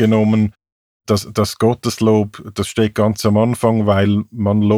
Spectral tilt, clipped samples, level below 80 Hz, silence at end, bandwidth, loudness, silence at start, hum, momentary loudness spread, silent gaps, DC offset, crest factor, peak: -6.5 dB/octave; under 0.1%; -48 dBFS; 0 s; 15.5 kHz; -16 LUFS; 0 s; none; 7 LU; 0.72-1.00 s; under 0.1%; 14 dB; 0 dBFS